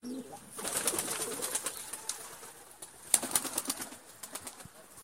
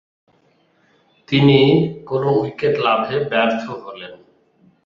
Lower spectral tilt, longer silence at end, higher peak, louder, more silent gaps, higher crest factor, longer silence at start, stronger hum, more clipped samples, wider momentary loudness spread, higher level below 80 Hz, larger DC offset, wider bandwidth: second, -0.5 dB/octave vs -8 dB/octave; second, 0 s vs 0.7 s; about the same, -2 dBFS vs -2 dBFS; second, -34 LUFS vs -17 LUFS; neither; first, 36 dB vs 18 dB; second, 0 s vs 1.3 s; neither; neither; about the same, 19 LU vs 19 LU; second, -70 dBFS vs -56 dBFS; neither; first, 16.5 kHz vs 7 kHz